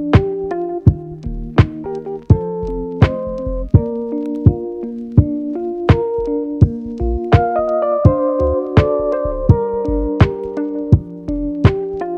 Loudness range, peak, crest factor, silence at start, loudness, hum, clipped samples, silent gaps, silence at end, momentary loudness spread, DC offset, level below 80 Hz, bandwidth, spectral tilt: 2 LU; 0 dBFS; 16 dB; 0 s; -17 LUFS; none; under 0.1%; none; 0 s; 9 LU; under 0.1%; -28 dBFS; 6.4 kHz; -10 dB/octave